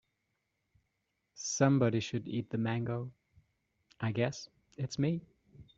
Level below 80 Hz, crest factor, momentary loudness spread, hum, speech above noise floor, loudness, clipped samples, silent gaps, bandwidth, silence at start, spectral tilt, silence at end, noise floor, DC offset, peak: -68 dBFS; 24 dB; 14 LU; none; 50 dB; -34 LUFS; under 0.1%; none; 7.8 kHz; 1.35 s; -5.5 dB/octave; 0.15 s; -83 dBFS; under 0.1%; -12 dBFS